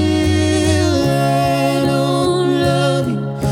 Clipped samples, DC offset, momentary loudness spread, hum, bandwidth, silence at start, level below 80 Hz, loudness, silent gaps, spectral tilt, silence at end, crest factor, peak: under 0.1%; under 0.1%; 2 LU; none; 16.5 kHz; 0 s; -38 dBFS; -15 LUFS; none; -6 dB/octave; 0 s; 12 dB; -2 dBFS